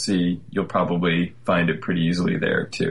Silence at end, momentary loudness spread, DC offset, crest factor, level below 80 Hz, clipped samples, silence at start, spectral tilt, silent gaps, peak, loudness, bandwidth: 0 s; 3 LU; 0.6%; 14 dB; -54 dBFS; under 0.1%; 0 s; -6 dB/octave; none; -8 dBFS; -22 LUFS; 11.5 kHz